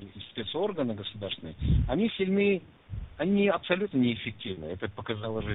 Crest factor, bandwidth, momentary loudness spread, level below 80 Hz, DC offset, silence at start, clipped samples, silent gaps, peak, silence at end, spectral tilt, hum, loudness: 18 dB; 4.1 kHz; 12 LU; -40 dBFS; under 0.1%; 0 s; under 0.1%; none; -10 dBFS; 0 s; -5 dB/octave; none; -30 LUFS